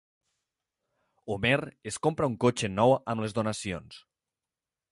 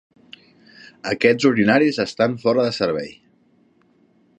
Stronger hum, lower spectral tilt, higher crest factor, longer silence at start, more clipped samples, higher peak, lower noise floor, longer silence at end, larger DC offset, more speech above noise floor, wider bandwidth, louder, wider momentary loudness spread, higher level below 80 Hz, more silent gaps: neither; about the same, -5 dB/octave vs -5.5 dB/octave; about the same, 20 dB vs 20 dB; first, 1.25 s vs 1.05 s; neither; second, -10 dBFS vs -2 dBFS; first, under -90 dBFS vs -58 dBFS; second, 0.95 s vs 1.3 s; neither; first, over 62 dB vs 40 dB; first, 11.5 kHz vs 9.4 kHz; second, -28 LUFS vs -19 LUFS; about the same, 13 LU vs 12 LU; about the same, -58 dBFS vs -60 dBFS; neither